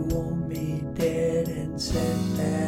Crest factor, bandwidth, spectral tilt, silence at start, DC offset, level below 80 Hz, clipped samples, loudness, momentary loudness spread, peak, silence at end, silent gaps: 14 dB; 17 kHz; -6.5 dB/octave; 0 s; under 0.1%; -40 dBFS; under 0.1%; -27 LUFS; 5 LU; -12 dBFS; 0 s; none